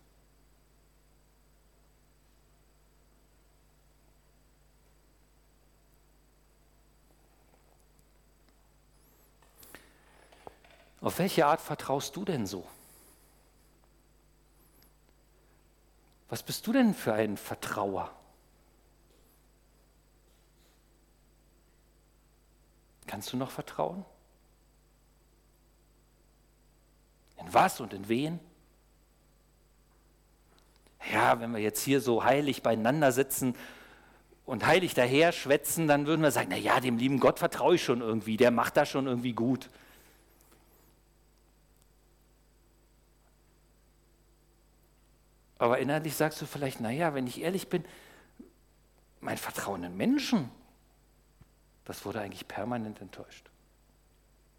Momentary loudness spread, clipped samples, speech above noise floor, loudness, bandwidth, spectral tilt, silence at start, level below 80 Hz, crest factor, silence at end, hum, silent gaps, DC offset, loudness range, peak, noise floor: 20 LU; under 0.1%; 35 dB; -30 LUFS; 18.5 kHz; -5 dB/octave; 9.75 s; -64 dBFS; 20 dB; 1.2 s; none; none; under 0.1%; 14 LU; -14 dBFS; -64 dBFS